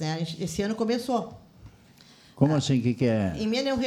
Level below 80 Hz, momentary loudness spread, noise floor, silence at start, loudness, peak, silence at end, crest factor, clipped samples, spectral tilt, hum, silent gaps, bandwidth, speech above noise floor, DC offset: -54 dBFS; 7 LU; -54 dBFS; 0 s; -26 LUFS; -8 dBFS; 0 s; 20 dB; under 0.1%; -6 dB/octave; none; none; 19 kHz; 28 dB; under 0.1%